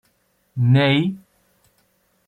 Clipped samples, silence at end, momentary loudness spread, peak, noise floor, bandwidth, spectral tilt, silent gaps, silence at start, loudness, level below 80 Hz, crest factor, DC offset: under 0.1%; 1.1 s; 20 LU; -6 dBFS; -65 dBFS; 4.5 kHz; -8 dB/octave; none; 0.55 s; -18 LUFS; -60 dBFS; 16 dB; under 0.1%